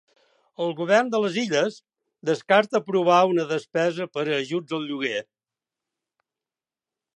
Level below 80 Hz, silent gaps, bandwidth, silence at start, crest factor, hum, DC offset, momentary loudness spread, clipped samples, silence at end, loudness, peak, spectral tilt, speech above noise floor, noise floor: -80 dBFS; none; 10.5 kHz; 0.6 s; 20 dB; none; under 0.1%; 10 LU; under 0.1%; 1.95 s; -23 LUFS; -4 dBFS; -5 dB/octave; over 67 dB; under -90 dBFS